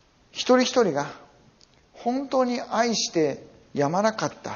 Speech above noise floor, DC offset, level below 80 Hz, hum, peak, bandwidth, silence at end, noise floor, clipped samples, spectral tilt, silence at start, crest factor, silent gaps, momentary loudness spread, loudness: 34 dB; under 0.1%; -66 dBFS; none; -8 dBFS; 7.2 kHz; 0 s; -57 dBFS; under 0.1%; -3.5 dB/octave; 0.35 s; 18 dB; none; 13 LU; -24 LUFS